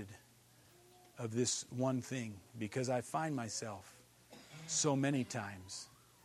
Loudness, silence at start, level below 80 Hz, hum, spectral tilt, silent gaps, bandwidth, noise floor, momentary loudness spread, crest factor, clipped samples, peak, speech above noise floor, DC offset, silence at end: -39 LUFS; 0 s; -78 dBFS; none; -4 dB/octave; none; 14 kHz; -65 dBFS; 21 LU; 20 dB; under 0.1%; -20 dBFS; 27 dB; under 0.1%; 0.3 s